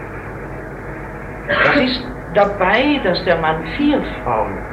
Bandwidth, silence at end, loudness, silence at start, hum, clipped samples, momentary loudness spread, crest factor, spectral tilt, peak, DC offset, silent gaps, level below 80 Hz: 9.8 kHz; 0 s; -16 LUFS; 0 s; none; under 0.1%; 16 LU; 18 dB; -6.5 dB/octave; 0 dBFS; under 0.1%; none; -36 dBFS